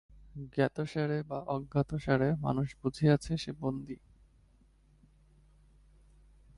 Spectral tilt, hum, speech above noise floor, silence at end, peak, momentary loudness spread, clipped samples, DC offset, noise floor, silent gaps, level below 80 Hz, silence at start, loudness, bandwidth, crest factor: -7.5 dB/octave; none; 32 dB; 2.65 s; -14 dBFS; 14 LU; under 0.1%; under 0.1%; -64 dBFS; none; -56 dBFS; 0.25 s; -33 LUFS; 11 kHz; 20 dB